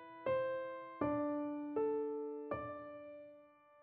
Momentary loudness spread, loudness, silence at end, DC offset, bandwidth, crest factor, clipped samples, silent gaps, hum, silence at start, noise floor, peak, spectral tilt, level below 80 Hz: 15 LU; -41 LUFS; 0 s; under 0.1%; 4.5 kHz; 18 dB; under 0.1%; none; none; 0 s; -63 dBFS; -24 dBFS; -6 dB/octave; -72 dBFS